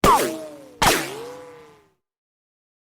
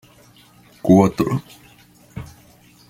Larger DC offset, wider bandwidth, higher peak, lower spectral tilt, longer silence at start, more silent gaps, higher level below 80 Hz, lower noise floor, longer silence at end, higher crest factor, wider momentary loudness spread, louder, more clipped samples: neither; first, over 20 kHz vs 16 kHz; about the same, -4 dBFS vs -2 dBFS; second, -3 dB/octave vs -8 dB/octave; second, 0.05 s vs 0.85 s; neither; first, -40 dBFS vs -50 dBFS; first, -57 dBFS vs -50 dBFS; first, 1.3 s vs 0.65 s; about the same, 20 dB vs 20 dB; second, 21 LU vs 24 LU; second, -20 LUFS vs -17 LUFS; neither